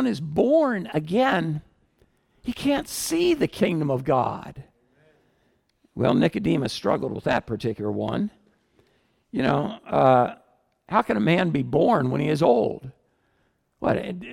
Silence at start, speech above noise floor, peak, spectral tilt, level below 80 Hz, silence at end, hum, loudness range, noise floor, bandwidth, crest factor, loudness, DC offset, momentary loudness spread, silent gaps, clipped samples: 0 s; 46 dB; -6 dBFS; -6 dB/octave; -54 dBFS; 0 s; none; 4 LU; -69 dBFS; 17 kHz; 18 dB; -23 LUFS; under 0.1%; 10 LU; none; under 0.1%